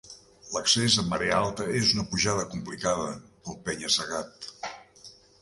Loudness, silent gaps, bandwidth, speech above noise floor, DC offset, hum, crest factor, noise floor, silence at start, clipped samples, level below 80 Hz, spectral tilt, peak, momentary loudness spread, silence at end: -26 LUFS; none; 11.5 kHz; 25 dB; under 0.1%; none; 22 dB; -52 dBFS; 0.05 s; under 0.1%; -54 dBFS; -3 dB/octave; -8 dBFS; 17 LU; 0.3 s